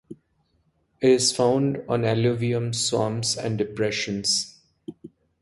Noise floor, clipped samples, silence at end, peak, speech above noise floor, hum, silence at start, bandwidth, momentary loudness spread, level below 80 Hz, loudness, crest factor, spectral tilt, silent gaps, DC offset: -68 dBFS; under 0.1%; 0.35 s; -8 dBFS; 45 dB; none; 0.1 s; 11.5 kHz; 16 LU; -58 dBFS; -23 LUFS; 18 dB; -4 dB/octave; none; under 0.1%